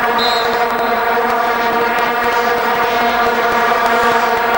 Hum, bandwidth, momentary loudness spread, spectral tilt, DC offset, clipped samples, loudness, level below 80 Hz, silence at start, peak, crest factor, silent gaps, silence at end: none; 17 kHz; 2 LU; -3 dB/octave; under 0.1%; under 0.1%; -14 LUFS; -44 dBFS; 0 s; -2 dBFS; 12 dB; none; 0 s